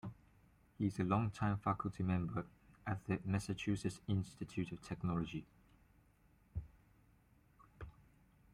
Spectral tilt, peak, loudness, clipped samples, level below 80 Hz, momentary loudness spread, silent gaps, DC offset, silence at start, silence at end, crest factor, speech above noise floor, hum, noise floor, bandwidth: -7 dB/octave; -22 dBFS; -41 LUFS; under 0.1%; -62 dBFS; 15 LU; none; under 0.1%; 0.05 s; 0.65 s; 20 dB; 31 dB; none; -70 dBFS; 12 kHz